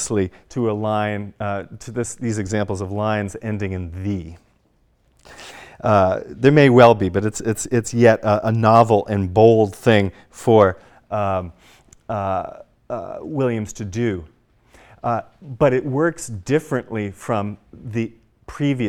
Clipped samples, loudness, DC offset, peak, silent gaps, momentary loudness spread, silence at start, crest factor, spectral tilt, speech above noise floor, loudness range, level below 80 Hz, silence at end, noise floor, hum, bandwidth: under 0.1%; -19 LUFS; under 0.1%; 0 dBFS; none; 17 LU; 0 s; 20 dB; -6.5 dB/octave; 42 dB; 11 LU; -50 dBFS; 0 s; -61 dBFS; none; 17 kHz